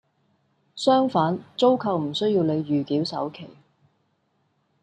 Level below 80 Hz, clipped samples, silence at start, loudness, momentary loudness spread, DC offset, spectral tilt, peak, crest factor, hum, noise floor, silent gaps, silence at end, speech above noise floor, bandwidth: -70 dBFS; under 0.1%; 0.75 s; -23 LUFS; 11 LU; under 0.1%; -6.5 dB/octave; -6 dBFS; 18 dB; none; -70 dBFS; none; 1.3 s; 47 dB; 9.4 kHz